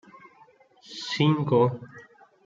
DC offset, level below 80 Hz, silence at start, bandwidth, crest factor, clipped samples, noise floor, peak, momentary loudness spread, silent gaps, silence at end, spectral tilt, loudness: under 0.1%; -68 dBFS; 0.9 s; 7.6 kHz; 18 dB; under 0.1%; -57 dBFS; -10 dBFS; 20 LU; none; 0.45 s; -6.5 dB/octave; -24 LUFS